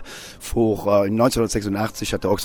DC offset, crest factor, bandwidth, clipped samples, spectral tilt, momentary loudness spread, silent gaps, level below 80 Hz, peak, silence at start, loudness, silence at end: under 0.1%; 16 dB; over 20 kHz; under 0.1%; -5.5 dB/octave; 9 LU; none; -40 dBFS; -4 dBFS; 0 s; -21 LUFS; 0 s